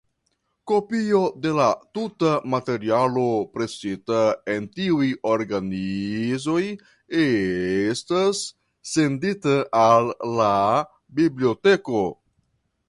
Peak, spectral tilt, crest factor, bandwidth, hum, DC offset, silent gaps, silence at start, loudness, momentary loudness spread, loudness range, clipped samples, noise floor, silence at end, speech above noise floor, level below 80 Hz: -4 dBFS; -5.5 dB/octave; 18 dB; 11.5 kHz; none; under 0.1%; none; 0.65 s; -22 LUFS; 9 LU; 3 LU; under 0.1%; -73 dBFS; 0.75 s; 51 dB; -58 dBFS